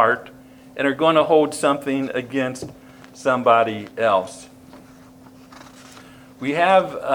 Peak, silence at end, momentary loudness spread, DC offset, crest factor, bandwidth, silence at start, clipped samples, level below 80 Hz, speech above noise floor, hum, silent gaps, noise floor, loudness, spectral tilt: -2 dBFS; 0 s; 15 LU; under 0.1%; 20 dB; 19.5 kHz; 0 s; under 0.1%; -62 dBFS; 26 dB; none; none; -45 dBFS; -19 LUFS; -5 dB/octave